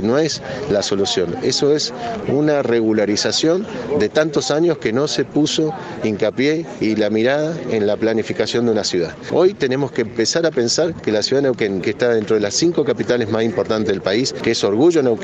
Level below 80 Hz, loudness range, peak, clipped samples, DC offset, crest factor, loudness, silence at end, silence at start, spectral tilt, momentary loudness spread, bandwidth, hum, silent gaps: -52 dBFS; 1 LU; -2 dBFS; under 0.1%; under 0.1%; 14 dB; -18 LUFS; 0 s; 0 s; -4.5 dB/octave; 5 LU; 8.6 kHz; none; none